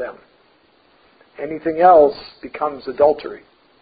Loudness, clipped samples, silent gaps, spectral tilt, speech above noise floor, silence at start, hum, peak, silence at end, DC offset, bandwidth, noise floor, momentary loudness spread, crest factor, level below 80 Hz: -16 LUFS; under 0.1%; none; -10 dB/octave; 39 dB; 0 s; none; -2 dBFS; 0.45 s; under 0.1%; 5 kHz; -56 dBFS; 22 LU; 18 dB; -56 dBFS